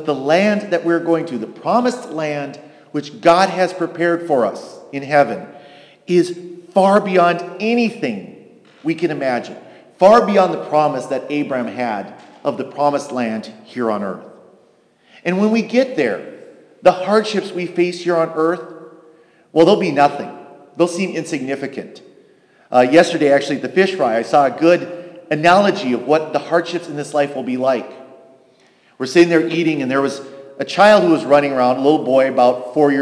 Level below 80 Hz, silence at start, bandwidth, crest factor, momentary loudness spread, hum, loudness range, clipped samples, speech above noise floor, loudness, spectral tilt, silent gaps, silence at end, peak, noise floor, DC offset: -64 dBFS; 0 s; 11 kHz; 16 dB; 15 LU; none; 6 LU; under 0.1%; 38 dB; -16 LUFS; -5.5 dB/octave; none; 0 s; 0 dBFS; -54 dBFS; under 0.1%